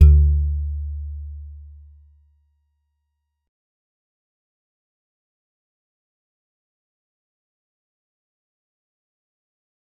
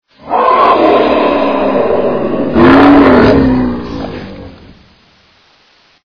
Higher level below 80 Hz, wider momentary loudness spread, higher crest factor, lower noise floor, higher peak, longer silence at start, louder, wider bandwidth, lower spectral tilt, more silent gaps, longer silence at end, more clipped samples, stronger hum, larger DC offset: about the same, -26 dBFS vs -30 dBFS; first, 24 LU vs 16 LU; first, 24 dB vs 10 dB; first, -76 dBFS vs -48 dBFS; about the same, -2 dBFS vs 0 dBFS; second, 0 s vs 0.2 s; second, -21 LUFS vs -8 LUFS; second, 1.4 kHz vs 5.4 kHz; first, -12 dB/octave vs -8.5 dB/octave; neither; first, 8.4 s vs 1.35 s; second, under 0.1% vs 1%; neither; second, under 0.1% vs 2%